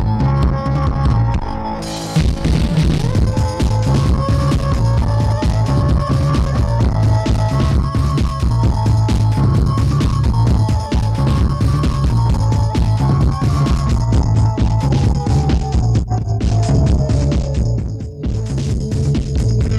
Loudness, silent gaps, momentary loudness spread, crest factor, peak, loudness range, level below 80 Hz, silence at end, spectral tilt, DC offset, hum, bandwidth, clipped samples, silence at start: -16 LUFS; none; 4 LU; 12 dB; -2 dBFS; 2 LU; -20 dBFS; 0 s; -7.5 dB/octave; under 0.1%; none; 11.5 kHz; under 0.1%; 0 s